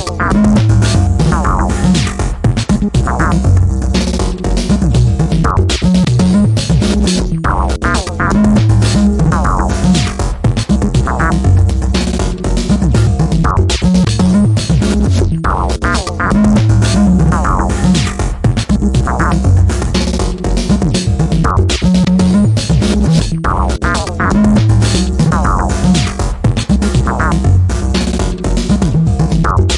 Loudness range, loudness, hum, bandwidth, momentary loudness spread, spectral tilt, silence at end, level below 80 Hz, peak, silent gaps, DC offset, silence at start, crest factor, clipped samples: 1 LU; -12 LUFS; none; 11.5 kHz; 5 LU; -6 dB/octave; 0 s; -18 dBFS; 0 dBFS; none; under 0.1%; 0 s; 10 dB; under 0.1%